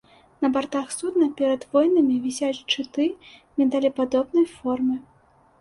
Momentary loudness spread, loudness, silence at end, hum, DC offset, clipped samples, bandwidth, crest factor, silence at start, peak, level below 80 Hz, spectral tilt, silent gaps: 7 LU; -23 LUFS; 0.6 s; none; under 0.1%; under 0.1%; 11.5 kHz; 16 dB; 0.4 s; -8 dBFS; -64 dBFS; -3.5 dB/octave; none